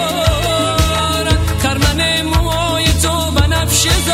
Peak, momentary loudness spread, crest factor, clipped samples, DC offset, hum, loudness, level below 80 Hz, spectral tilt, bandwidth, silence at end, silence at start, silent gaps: 0 dBFS; 3 LU; 14 dB; under 0.1%; under 0.1%; none; -14 LUFS; -22 dBFS; -3.5 dB/octave; 16 kHz; 0 s; 0 s; none